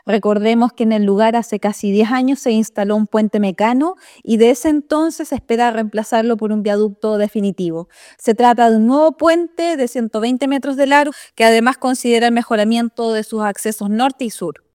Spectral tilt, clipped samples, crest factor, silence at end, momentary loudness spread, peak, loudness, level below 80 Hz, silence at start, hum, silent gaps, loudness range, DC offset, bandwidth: -5 dB/octave; under 0.1%; 16 dB; 0.2 s; 8 LU; 0 dBFS; -16 LUFS; -58 dBFS; 0.05 s; none; none; 2 LU; under 0.1%; 16 kHz